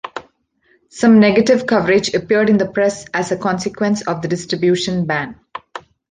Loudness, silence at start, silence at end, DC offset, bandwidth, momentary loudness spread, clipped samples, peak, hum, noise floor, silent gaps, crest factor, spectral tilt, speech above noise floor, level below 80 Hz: -16 LUFS; 0.05 s; 0.3 s; under 0.1%; 9.6 kHz; 20 LU; under 0.1%; -2 dBFS; none; -59 dBFS; none; 14 dB; -5.5 dB/octave; 44 dB; -52 dBFS